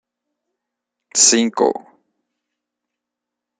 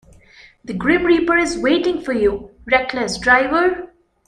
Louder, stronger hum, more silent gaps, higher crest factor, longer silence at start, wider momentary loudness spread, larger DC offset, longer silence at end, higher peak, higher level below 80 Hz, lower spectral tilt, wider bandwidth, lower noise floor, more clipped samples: first, -14 LUFS vs -17 LUFS; neither; neither; about the same, 22 dB vs 18 dB; first, 1.15 s vs 0.65 s; first, 11 LU vs 8 LU; neither; first, 1.8 s vs 0.4 s; about the same, 0 dBFS vs -2 dBFS; second, -72 dBFS vs -44 dBFS; second, -1 dB/octave vs -4.5 dB/octave; about the same, 10.5 kHz vs 10.5 kHz; first, -83 dBFS vs -47 dBFS; neither